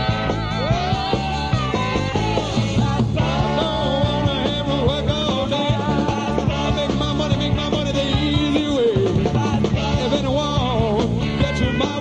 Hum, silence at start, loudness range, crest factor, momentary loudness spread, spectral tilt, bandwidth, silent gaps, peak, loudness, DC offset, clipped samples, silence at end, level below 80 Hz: none; 0 s; 1 LU; 14 dB; 2 LU; -6 dB/octave; 9.8 kHz; none; -4 dBFS; -20 LUFS; 0.2%; under 0.1%; 0 s; -32 dBFS